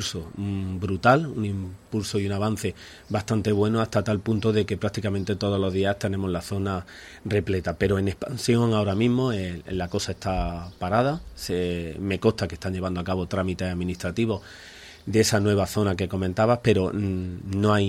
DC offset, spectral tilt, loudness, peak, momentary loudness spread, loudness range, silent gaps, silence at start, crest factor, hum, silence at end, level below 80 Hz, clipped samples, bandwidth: under 0.1%; -6 dB/octave; -25 LUFS; -4 dBFS; 9 LU; 3 LU; none; 0 s; 20 dB; none; 0 s; -46 dBFS; under 0.1%; 15 kHz